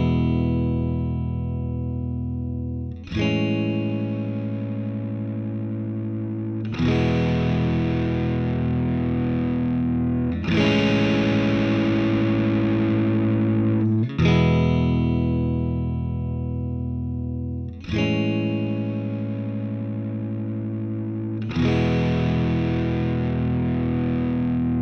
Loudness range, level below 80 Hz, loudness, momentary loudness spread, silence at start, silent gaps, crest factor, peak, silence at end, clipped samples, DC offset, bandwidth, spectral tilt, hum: 6 LU; -42 dBFS; -23 LUFS; 8 LU; 0 s; none; 16 dB; -6 dBFS; 0 s; under 0.1%; under 0.1%; 6.6 kHz; -8.5 dB/octave; none